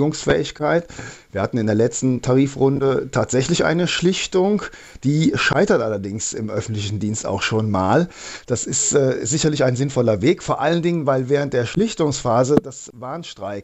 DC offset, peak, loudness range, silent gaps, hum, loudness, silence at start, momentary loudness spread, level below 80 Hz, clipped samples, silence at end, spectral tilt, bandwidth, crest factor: under 0.1%; 0 dBFS; 2 LU; none; none; -19 LUFS; 0 s; 9 LU; -48 dBFS; under 0.1%; 0 s; -5 dB/octave; 8.4 kHz; 18 dB